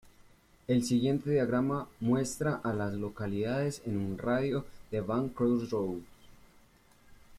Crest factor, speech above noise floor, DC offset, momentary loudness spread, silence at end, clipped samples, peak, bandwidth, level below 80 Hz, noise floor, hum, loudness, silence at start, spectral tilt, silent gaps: 16 dB; 31 dB; under 0.1%; 8 LU; 0 s; under 0.1%; -16 dBFS; 15 kHz; -60 dBFS; -62 dBFS; none; -32 LUFS; 0.7 s; -6.5 dB/octave; none